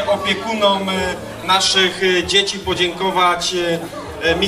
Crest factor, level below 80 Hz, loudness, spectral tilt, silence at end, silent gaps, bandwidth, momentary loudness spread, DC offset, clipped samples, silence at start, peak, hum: 16 dB; -42 dBFS; -16 LUFS; -3 dB/octave; 0 s; none; 15.5 kHz; 8 LU; under 0.1%; under 0.1%; 0 s; 0 dBFS; none